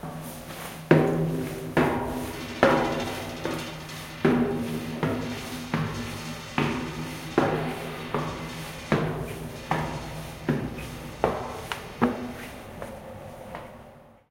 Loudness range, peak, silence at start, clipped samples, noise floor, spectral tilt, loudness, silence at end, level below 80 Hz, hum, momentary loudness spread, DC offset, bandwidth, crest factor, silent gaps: 6 LU; -2 dBFS; 0 s; under 0.1%; -50 dBFS; -6 dB/octave; -28 LUFS; 0.2 s; -48 dBFS; none; 16 LU; under 0.1%; 16.5 kHz; 26 dB; none